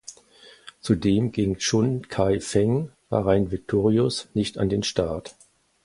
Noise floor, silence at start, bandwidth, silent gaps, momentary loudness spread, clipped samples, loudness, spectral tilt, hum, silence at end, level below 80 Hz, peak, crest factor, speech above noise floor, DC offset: -52 dBFS; 0.1 s; 11.5 kHz; none; 6 LU; under 0.1%; -24 LUFS; -6 dB/octave; none; 0.55 s; -46 dBFS; -4 dBFS; 20 dB; 29 dB; under 0.1%